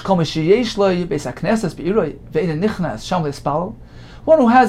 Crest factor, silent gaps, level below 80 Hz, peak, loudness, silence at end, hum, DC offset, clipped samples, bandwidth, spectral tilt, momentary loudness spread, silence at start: 16 dB; none; -40 dBFS; -2 dBFS; -18 LUFS; 0 s; none; under 0.1%; under 0.1%; 13.5 kHz; -6.5 dB/octave; 9 LU; 0 s